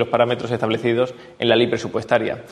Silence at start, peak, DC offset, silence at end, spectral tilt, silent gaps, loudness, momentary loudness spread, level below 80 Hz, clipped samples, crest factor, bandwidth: 0 s; -2 dBFS; under 0.1%; 0 s; -6 dB/octave; none; -20 LUFS; 6 LU; -58 dBFS; under 0.1%; 18 dB; 10.5 kHz